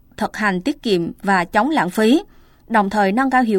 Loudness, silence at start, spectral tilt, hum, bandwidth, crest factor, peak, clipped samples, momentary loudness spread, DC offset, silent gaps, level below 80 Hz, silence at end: -18 LUFS; 0.2 s; -5.5 dB/octave; none; 17 kHz; 16 dB; -2 dBFS; under 0.1%; 4 LU; under 0.1%; none; -48 dBFS; 0 s